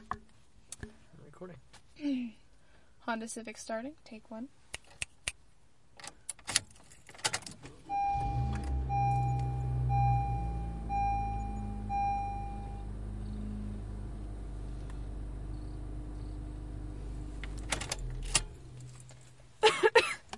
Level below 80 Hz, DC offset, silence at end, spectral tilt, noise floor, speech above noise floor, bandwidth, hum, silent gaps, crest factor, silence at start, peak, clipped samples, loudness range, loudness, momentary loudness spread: -42 dBFS; 0.1%; 0 s; -4 dB/octave; -66 dBFS; 27 dB; 11.5 kHz; none; none; 30 dB; 0 s; -6 dBFS; under 0.1%; 10 LU; -35 LUFS; 19 LU